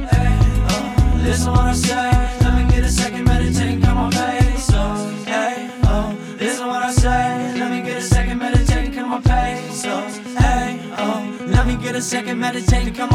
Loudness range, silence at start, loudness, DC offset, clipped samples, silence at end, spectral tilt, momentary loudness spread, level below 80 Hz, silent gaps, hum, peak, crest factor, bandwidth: 3 LU; 0 s; -18 LUFS; under 0.1%; under 0.1%; 0 s; -5.5 dB/octave; 6 LU; -20 dBFS; none; none; 0 dBFS; 16 dB; 13.5 kHz